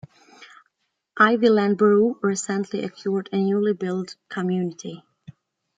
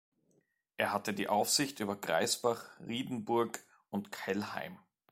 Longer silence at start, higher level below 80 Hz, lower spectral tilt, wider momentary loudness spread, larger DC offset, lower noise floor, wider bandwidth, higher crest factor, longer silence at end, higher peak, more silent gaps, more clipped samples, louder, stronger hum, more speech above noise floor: second, 0.4 s vs 0.8 s; first, -70 dBFS vs -78 dBFS; first, -5.5 dB/octave vs -3 dB/octave; first, 15 LU vs 11 LU; neither; about the same, -73 dBFS vs -75 dBFS; second, 9.4 kHz vs 16.5 kHz; about the same, 20 dB vs 20 dB; first, 0.8 s vs 0.35 s; first, -2 dBFS vs -16 dBFS; neither; neither; first, -22 LUFS vs -34 LUFS; neither; first, 52 dB vs 41 dB